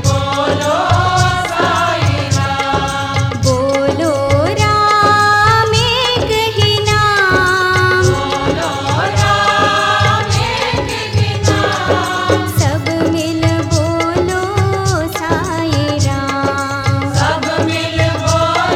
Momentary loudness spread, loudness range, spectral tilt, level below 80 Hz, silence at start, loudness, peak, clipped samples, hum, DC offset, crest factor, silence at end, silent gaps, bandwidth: 5 LU; 4 LU; -4.5 dB/octave; -34 dBFS; 0 s; -13 LUFS; 0 dBFS; under 0.1%; none; under 0.1%; 14 dB; 0 s; none; 15 kHz